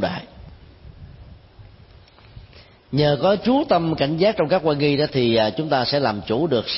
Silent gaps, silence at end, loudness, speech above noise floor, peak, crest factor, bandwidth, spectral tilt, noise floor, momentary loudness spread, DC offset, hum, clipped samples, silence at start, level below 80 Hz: none; 0 s; -20 LUFS; 29 dB; -6 dBFS; 16 dB; 5.8 kHz; -10 dB/octave; -48 dBFS; 4 LU; under 0.1%; none; under 0.1%; 0 s; -48 dBFS